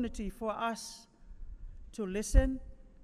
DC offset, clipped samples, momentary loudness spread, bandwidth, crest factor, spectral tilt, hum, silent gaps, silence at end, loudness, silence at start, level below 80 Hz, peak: under 0.1%; under 0.1%; 23 LU; 13 kHz; 22 dB; -5.5 dB/octave; none; none; 0 s; -35 LUFS; 0 s; -36 dBFS; -12 dBFS